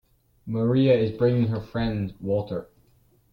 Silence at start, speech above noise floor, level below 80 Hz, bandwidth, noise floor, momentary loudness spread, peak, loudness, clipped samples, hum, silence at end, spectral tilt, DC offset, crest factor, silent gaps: 0.45 s; 38 dB; -50 dBFS; 5.6 kHz; -61 dBFS; 13 LU; -8 dBFS; -24 LUFS; under 0.1%; none; 0.7 s; -10 dB/octave; under 0.1%; 16 dB; none